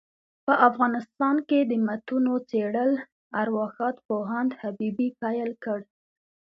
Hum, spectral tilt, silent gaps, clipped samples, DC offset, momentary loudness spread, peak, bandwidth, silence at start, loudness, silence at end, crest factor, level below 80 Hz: none; -8.5 dB/octave; 3.12-3.31 s, 4.05-4.09 s; under 0.1%; under 0.1%; 10 LU; -4 dBFS; 5.8 kHz; 0.45 s; -26 LUFS; 0.65 s; 22 dB; -74 dBFS